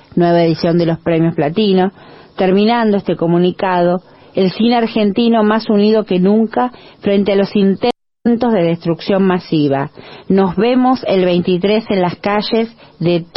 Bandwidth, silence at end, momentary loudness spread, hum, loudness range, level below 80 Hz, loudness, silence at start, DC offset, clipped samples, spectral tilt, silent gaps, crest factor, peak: 5.8 kHz; 0.15 s; 6 LU; none; 1 LU; -50 dBFS; -14 LUFS; 0.15 s; under 0.1%; under 0.1%; -9.5 dB/octave; none; 10 dB; -2 dBFS